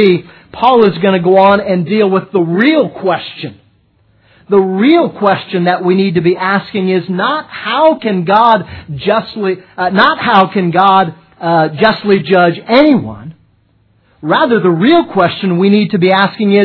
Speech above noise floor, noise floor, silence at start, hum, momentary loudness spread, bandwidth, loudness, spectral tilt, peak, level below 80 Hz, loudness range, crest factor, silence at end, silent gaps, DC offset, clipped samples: 42 dB; -53 dBFS; 0 s; none; 9 LU; 5.4 kHz; -11 LUFS; -9 dB/octave; 0 dBFS; -50 dBFS; 3 LU; 10 dB; 0 s; none; under 0.1%; 0.2%